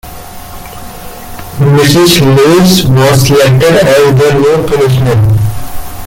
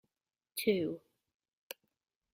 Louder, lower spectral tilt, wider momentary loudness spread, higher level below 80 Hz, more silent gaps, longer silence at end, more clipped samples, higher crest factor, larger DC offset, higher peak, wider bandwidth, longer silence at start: first, -6 LUFS vs -35 LUFS; about the same, -5.5 dB/octave vs -4.5 dB/octave; first, 21 LU vs 18 LU; first, -28 dBFS vs -78 dBFS; neither; second, 0 s vs 1.35 s; first, 0.1% vs under 0.1%; second, 8 dB vs 22 dB; neither; first, 0 dBFS vs -18 dBFS; about the same, 17.5 kHz vs 16 kHz; second, 0.05 s vs 0.55 s